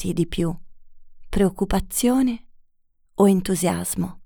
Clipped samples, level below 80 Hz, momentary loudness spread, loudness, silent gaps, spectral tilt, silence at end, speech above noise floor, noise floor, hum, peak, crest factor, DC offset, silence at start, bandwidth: under 0.1%; -38 dBFS; 11 LU; -22 LUFS; none; -5.5 dB/octave; 0 s; 40 dB; -61 dBFS; none; -6 dBFS; 18 dB; under 0.1%; 0 s; over 20 kHz